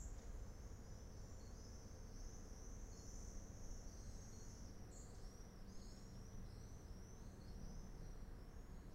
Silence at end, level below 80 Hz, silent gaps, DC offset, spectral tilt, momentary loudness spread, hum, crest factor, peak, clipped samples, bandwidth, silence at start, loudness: 0 s; -56 dBFS; none; under 0.1%; -5 dB/octave; 3 LU; none; 14 dB; -40 dBFS; under 0.1%; 16 kHz; 0 s; -58 LUFS